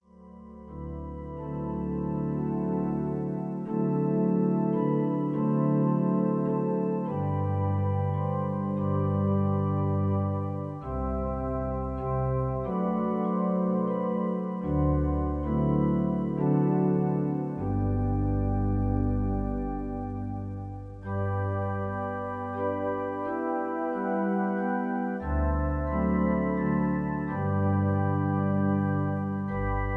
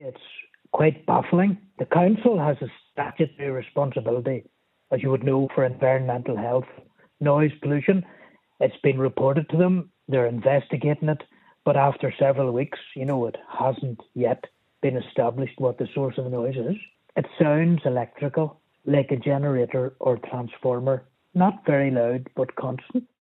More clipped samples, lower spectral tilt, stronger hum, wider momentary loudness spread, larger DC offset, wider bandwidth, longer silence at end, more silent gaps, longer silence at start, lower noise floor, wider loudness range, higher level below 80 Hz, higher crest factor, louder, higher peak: neither; about the same, -11.5 dB/octave vs -11 dB/octave; neither; about the same, 8 LU vs 10 LU; neither; second, 3.1 kHz vs 4.1 kHz; second, 0 s vs 0.2 s; neither; first, 0.2 s vs 0 s; about the same, -49 dBFS vs -46 dBFS; about the same, 5 LU vs 3 LU; first, -40 dBFS vs -68 dBFS; about the same, 14 dB vs 18 dB; second, -28 LUFS vs -24 LUFS; second, -14 dBFS vs -4 dBFS